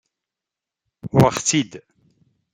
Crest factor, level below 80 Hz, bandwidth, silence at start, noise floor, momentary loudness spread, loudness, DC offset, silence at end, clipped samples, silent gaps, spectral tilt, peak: 22 dB; -52 dBFS; 16 kHz; 1.05 s; -87 dBFS; 16 LU; -18 LUFS; under 0.1%; 0.75 s; under 0.1%; none; -4.5 dB/octave; -2 dBFS